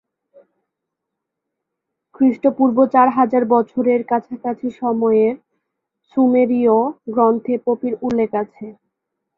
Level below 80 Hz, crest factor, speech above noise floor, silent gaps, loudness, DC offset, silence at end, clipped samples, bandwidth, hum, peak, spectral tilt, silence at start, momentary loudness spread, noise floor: -62 dBFS; 16 dB; 64 dB; none; -17 LUFS; under 0.1%; 0.65 s; under 0.1%; 4.1 kHz; none; -2 dBFS; -9 dB/octave; 2.2 s; 11 LU; -80 dBFS